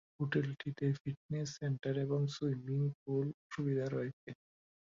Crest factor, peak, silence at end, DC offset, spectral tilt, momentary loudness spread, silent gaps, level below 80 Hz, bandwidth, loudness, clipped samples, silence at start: 16 dB; -22 dBFS; 0.6 s; under 0.1%; -7.5 dB/octave; 6 LU; 1.00-1.05 s, 1.17-1.29 s, 2.94-3.06 s, 3.34-3.50 s, 4.13-4.27 s; -72 dBFS; 7.4 kHz; -38 LUFS; under 0.1%; 0.2 s